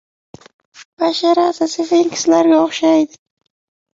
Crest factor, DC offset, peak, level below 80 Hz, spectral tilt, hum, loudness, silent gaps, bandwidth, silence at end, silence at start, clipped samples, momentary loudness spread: 14 dB; under 0.1%; -2 dBFS; -62 dBFS; -3.5 dB/octave; none; -15 LUFS; 0.85-0.97 s; 7.8 kHz; 0.9 s; 0.8 s; under 0.1%; 7 LU